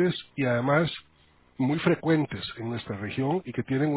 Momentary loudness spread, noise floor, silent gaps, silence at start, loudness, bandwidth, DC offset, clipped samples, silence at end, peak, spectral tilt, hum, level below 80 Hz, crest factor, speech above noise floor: 10 LU; -60 dBFS; none; 0 s; -27 LUFS; 4 kHz; under 0.1%; under 0.1%; 0 s; -8 dBFS; -11 dB/octave; none; -58 dBFS; 18 dB; 34 dB